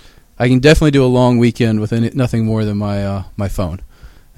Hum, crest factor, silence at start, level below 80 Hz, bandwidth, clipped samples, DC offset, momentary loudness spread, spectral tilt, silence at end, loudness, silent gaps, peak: none; 14 dB; 0.4 s; -30 dBFS; 14 kHz; under 0.1%; under 0.1%; 12 LU; -7 dB/octave; 0.3 s; -14 LUFS; none; 0 dBFS